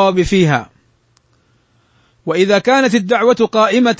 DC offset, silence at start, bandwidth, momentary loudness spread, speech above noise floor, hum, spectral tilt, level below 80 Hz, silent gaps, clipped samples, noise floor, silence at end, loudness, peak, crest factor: under 0.1%; 0 s; 8 kHz; 7 LU; 44 dB; none; -5.5 dB/octave; -42 dBFS; none; under 0.1%; -57 dBFS; 0.05 s; -13 LUFS; -2 dBFS; 14 dB